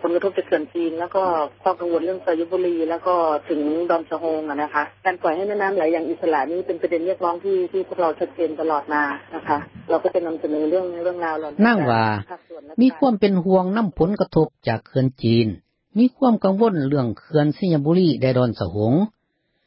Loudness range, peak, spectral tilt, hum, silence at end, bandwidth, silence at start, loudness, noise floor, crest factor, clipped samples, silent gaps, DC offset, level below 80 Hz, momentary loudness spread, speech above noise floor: 4 LU; -6 dBFS; -12 dB/octave; none; 0.55 s; 5.8 kHz; 0 s; -21 LUFS; -70 dBFS; 16 dB; under 0.1%; none; under 0.1%; -52 dBFS; 7 LU; 50 dB